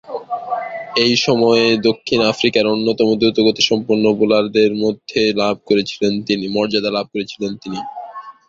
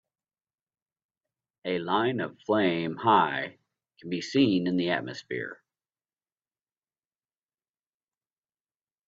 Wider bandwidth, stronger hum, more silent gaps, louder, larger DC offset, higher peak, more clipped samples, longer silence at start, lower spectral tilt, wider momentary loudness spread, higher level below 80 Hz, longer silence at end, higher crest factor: about the same, 7.6 kHz vs 7.6 kHz; neither; neither; first, -16 LUFS vs -27 LUFS; neither; first, 0 dBFS vs -8 dBFS; neither; second, 0.05 s vs 1.65 s; second, -4.5 dB/octave vs -6 dB/octave; about the same, 12 LU vs 13 LU; first, -56 dBFS vs -70 dBFS; second, 0.15 s vs 3.55 s; second, 16 dB vs 24 dB